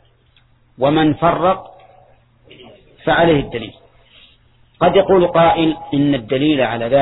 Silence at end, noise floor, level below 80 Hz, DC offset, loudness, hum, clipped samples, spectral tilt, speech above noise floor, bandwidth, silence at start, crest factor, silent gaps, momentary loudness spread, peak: 0 s; -54 dBFS; -44 dBFS; under 0.1%; -15 LUFS; none; under 0.1%; -10 dB/octave; 39 dB; 4.1 kHz; 0.8 s; 16 dB; none; 10 LU; 0 dBFS